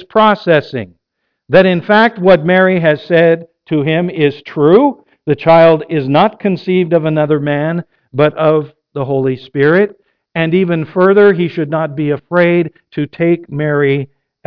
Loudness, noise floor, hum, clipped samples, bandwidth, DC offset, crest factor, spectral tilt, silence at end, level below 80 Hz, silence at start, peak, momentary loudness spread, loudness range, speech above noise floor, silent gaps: -12 LUFS; -71 dBFS; none; under 0.1%; 5.4 kHz; under 0.1%; 12 dB; -9.5 dB/octave; 0.4 s; -52 dBFS; 0 s; 0 dBFS; 10 LU; 3 LU; 60 dB; none